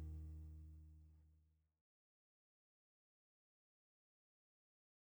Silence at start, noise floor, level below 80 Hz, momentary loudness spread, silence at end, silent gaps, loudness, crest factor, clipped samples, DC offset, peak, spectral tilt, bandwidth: 0 s; -78 dBFS; -64 dBFS; 12 LU; 3.65 s; none; -58 LUFS; 18 dB; under 0.1%; under 0.1%; -44 dBFS; -8.5 dB/octave; over 20 kHz